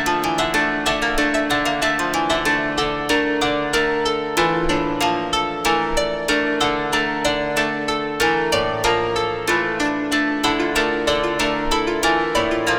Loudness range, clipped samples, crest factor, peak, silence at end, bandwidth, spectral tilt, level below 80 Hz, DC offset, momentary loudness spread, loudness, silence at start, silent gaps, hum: 1 LU; under 0.1%; 14 dB; -6 dBFS; 0 s; over 20 kHz; -3 dB/octave; -38 dBFS; under 0.1%; 2 LU; -19 LUFS; 0 s; none; none